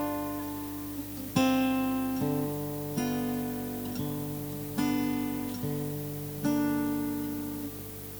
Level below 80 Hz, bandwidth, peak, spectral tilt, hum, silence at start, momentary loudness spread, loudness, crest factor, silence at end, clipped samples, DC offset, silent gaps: -54 dBFS; over 20 kHz; -12 dBFS; -5.5 dB/octave; 50 Hz at -45 dBFS; 0 s; 9 LU; -32 LUFS; 20 dB; 0 s; under 0.1%; under 0.1%; none